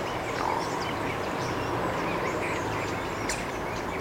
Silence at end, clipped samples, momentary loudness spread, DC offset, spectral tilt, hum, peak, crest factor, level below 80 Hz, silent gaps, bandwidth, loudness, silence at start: 0 s; under 0.1%; 2 LU; under 0.1%; -4.5 dB/octave; none; -14 dBFS; 16 dB; -48 dBFS; none; 16 kHz; -30 LUFS; 0 s